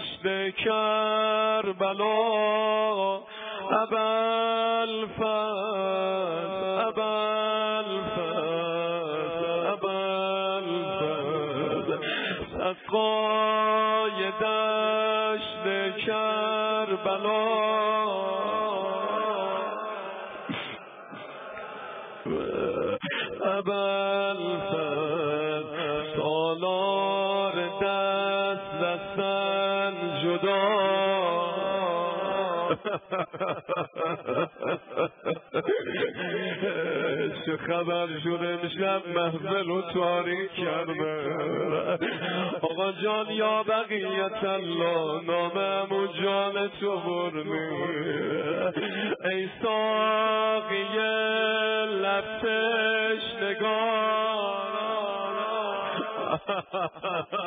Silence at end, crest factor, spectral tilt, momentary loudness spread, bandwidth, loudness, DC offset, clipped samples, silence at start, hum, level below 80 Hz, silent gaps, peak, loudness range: 0 s; 16 dB; -2.5 dB/octave; 6 LU; 4.7 kHz; -27 LUFS; under 0.1%; under 0.1%; 0 s; none; -66 dBFS; none; -12 dBFS; 4 LU